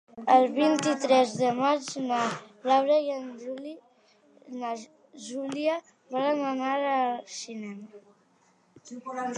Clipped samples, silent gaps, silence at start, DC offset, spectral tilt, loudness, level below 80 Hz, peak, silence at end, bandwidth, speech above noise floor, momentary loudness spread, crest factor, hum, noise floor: under 0.1%; none; 0.15 s; under 0.1%; -4 dB/octave; -27 LUFS; -82 dBFS; -8 dBFS; 0 s; 11 kHz; 38 dB; 17 LU; 20 dB; none; -65 dBFS